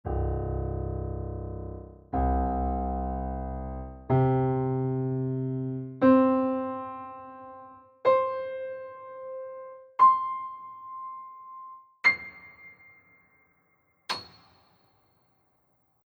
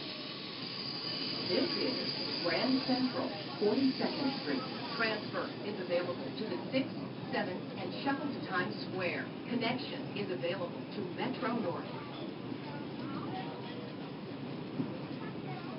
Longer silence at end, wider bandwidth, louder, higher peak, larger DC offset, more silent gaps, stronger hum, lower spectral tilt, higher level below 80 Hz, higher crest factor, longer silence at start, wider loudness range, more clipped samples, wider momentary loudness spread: first, 1.8 s vs 0 s; first, 9.4 kHz vs 5.6 kHz; first, -28 LUFS vs -36 LUFS; first, -10 dBFS vs -18 dBFS; neither; neither; neither; about the same, -8 dB/octave vs -9 dB/octave; first, -40 dBFS vs -74 dBFS; about the same, 20 dB vs 18 dB; about the same, 0.05 s vs 0 s; about the same, 6 LU vs 7 LU; neither; first, 23 LU vs 10 LU